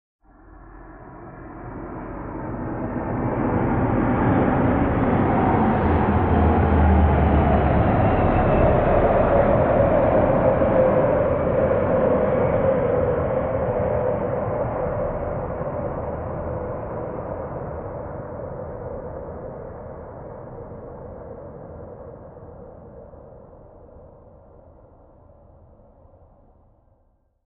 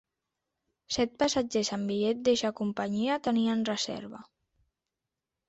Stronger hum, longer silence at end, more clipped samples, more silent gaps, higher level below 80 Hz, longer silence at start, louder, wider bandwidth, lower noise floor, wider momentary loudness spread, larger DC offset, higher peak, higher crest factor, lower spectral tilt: neither; first, 3.4 s vs 1.25 s; neither; neither; first, -32 dBFS vs -64 dBFS; second, 0.45 s vs 0.9 s; first, -21 LUFS vs -29 LUFS; second, 4 kHz vs 8.2 kHz; second, -63 dBFS vs -88 dBFS; first, 20 LU vs 8 LU; neither; first, -4 dBFS vs -14 dBFS; about the same, 18 dB vs 18 dB; first, -8.5 dB/octave vs -4 dB/octave